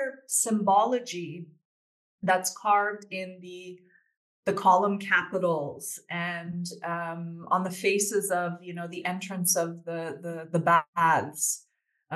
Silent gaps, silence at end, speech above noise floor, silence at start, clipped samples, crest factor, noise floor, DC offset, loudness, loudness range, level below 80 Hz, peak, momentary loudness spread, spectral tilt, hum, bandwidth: 1.65-2.18 s, 4.17-4.43 s, 10.88-10.93 s; 0 s; over 62 dB; 0 s; under 0.1%; 18 dB; under -90 dBFS; under 0.1%; -27 LUFS; 3 LU; -80 dBFS; -10 dBFS; 14 LU; -3.5 dB/octave; none; 12.5 kHz